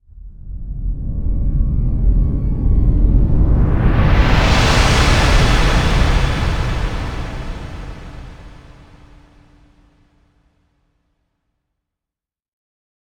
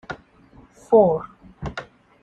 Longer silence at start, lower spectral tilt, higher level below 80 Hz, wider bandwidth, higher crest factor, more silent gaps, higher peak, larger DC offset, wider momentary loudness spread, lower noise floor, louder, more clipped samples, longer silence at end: about the same, 0.2 s vs 0.1 s; second, -5.5 dB/octave vs -8 dB/octave; first, -18 dBFS vs -48 dBFS; first, 11.5 kHz vs 8.8 kHz; about the same, 16 dB vs 18 dB; neither; first, 0 dBFS vs -4 dBFS; neither; second, 18 LU vs 22 LU; first, -88 dBFS vs -51 dBFS; about the same, -16 LUFS vs -18 LUFS; neither; first, 4.65 s vs 0.4 s